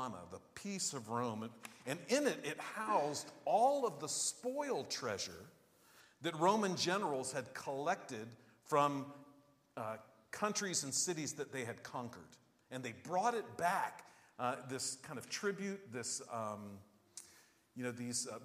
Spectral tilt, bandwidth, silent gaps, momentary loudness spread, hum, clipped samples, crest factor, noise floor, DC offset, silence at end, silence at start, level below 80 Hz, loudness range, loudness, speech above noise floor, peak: -3 dB/octave; 15.5 kHz; none; 17 LU; none; under 0.1%; 22 dB; -67 dBFS; under 0.1%; 0 s; 0 s; -84 dBFS; 5 LU; -39 LUFS; 28 dB; -18 dBFS